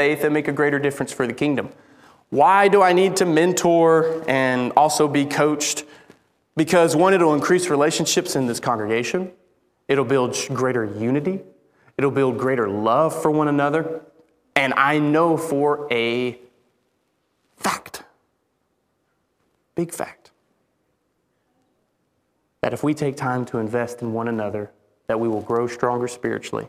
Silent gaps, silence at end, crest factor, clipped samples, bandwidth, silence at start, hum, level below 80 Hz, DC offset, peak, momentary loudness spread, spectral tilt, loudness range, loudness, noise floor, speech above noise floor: none; 0 s; 22 dB; under 0.1%; 16 kHz; 0 s; none; -64 dBFS; under 0.1%; 0 dBFS; 12 LU; -4.5 dB/octave; 16 LU; -20 LUFS; -70 dBFS; 50 dB